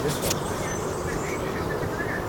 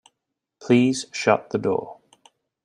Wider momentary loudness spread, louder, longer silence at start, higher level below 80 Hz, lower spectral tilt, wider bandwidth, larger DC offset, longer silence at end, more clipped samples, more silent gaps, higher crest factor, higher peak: second, 3 LU vs 16 LU; second, -28 LUFS vs -22 LUFS; second, 0 s vs 0.6 s; first, -42 dBFS vs -66 dBFS; about the same, -4.5 dB/octave vs -5.5 dB/octave; first, 18 kHz vs 10.5 kHz; first, 0.1% vs under 0.1%; second, 0 s vs 0.7 s; neither; neither; about the same, 18 dB vs 22 dB; second, -10 dBFS vs -2 dBFS